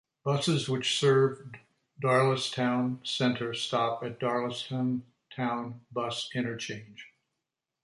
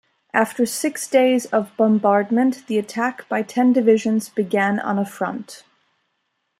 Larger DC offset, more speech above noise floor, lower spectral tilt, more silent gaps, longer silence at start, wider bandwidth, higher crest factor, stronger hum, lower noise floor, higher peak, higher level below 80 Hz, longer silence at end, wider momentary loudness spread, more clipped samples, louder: neither; about the same, 57 dB vs 54 dB; about the same, -5 dB/octave vs -5 dB/octave; neither; about the same, 0.25 s vs 0.35 s; second, 11.5 kHz vs 16 kHz; about the same, 18 dB vs 18 dB; neither; first, -86 dBFS vs -73 dBFS; second, -12 dBFS vs -2 dBFS; about the same, -70 dBFS vs -72 dBFS; second, 0.75 s vs 1 s; first, 13 LU vs 8 LU; neither; second, -29 LUFS vs -20 LUFS